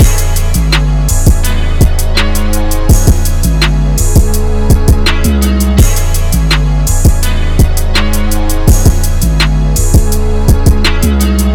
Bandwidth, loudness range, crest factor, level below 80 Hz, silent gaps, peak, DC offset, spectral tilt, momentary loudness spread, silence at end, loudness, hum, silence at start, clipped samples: 18.5 kHz; 1 LU; 8 dB; -10 dBFS; none; 0 dBFS; under 0.1%; -5 dB/octave; 4 LU; 0 s; -11 LUFS; none; 0 s; 2%